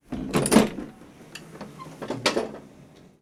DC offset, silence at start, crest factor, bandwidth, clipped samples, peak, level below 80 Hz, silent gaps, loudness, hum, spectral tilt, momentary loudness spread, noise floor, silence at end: under 0.1%; 0.1 s; 26 dB; 18 kHz; under 0.1%; -2 dBFS; -50 dBFS; none; -24 LUFS; none; -4.5 dB/octave; 23 LU; -51 dBFS; 0.4 s